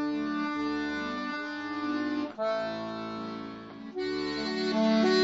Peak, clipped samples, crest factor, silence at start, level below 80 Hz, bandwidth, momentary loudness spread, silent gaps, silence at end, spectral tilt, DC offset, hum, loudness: -14 dBFS; under 0.1%; 18 dB; 0 s; -64 dBFS; 8 kHz; 11 LU; none; 0 s; -5 dB/octave; under 0.1%; none; -31 LUFS